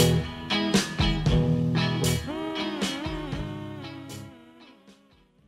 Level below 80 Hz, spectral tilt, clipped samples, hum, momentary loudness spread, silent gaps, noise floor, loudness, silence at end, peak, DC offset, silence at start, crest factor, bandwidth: -38 dBFS; -5 dB/octave; under 0.1%; none; 16 LU; none; -60 dBFS; -26 LUFS; 0.55 s; -6 dBFS; under 0.1%; 0 s; 20 dB; 16 kHz